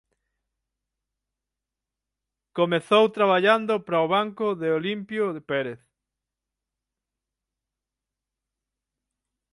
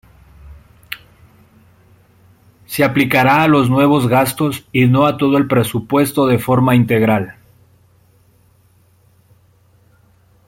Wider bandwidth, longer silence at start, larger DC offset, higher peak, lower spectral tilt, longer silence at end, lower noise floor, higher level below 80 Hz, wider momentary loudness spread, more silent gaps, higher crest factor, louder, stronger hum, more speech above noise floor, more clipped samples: second, 11.5 kHz vs 16.5 kHz; first, 2.55 s vs 0.45 s; neither; second, -6 dBFS vs 0 dBFS; about the same, -6 dB/octave vs -6.5 dB/octave; first, 3.8 s vs 3.15 s; first, -87 dBFS vs -53 dBFS; second, -74 dBFS vs -50 dBFS; second, 9 LU vs 13 LU; neither; first, 22 dB vs 16 dB; second, -23 LUFS vs -14 LUFS; neither; first, 64 dB vs 40 dB; neither